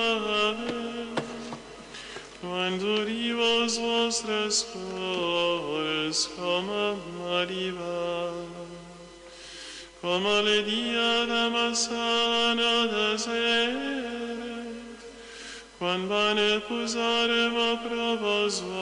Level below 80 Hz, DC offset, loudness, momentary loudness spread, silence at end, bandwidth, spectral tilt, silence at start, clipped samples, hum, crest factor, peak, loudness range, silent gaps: -60 dBFS; under 0.1%; -26 LUFS; 18 LU; 0 s; 11 kHz; -2.5 dB/octave; 0 s; under 0.1%; none; 14 dB; -14 dBFS; 6 LU; none